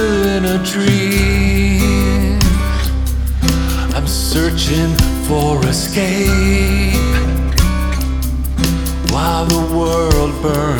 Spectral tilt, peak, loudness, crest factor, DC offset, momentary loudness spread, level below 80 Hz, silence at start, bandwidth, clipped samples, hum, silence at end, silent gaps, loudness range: -5 dB/octave; 0 dBFS; -15 LUFS; 14 dB; under 0.1%; 4 LU; -18 dBFS; 0 s; over 20 kHz; under 0.1%; none; 0 s; none; 1 LU